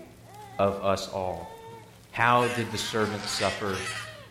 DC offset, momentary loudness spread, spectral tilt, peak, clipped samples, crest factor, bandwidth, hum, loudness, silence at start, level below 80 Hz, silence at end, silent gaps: under 0.1%; 22 LU; -4 dB/octave; -6 dBFS; under 0.1%; 22 dB; 16.5 kHz; none; -28 LUFS; 0 s; -58 dBFS; 0 s; none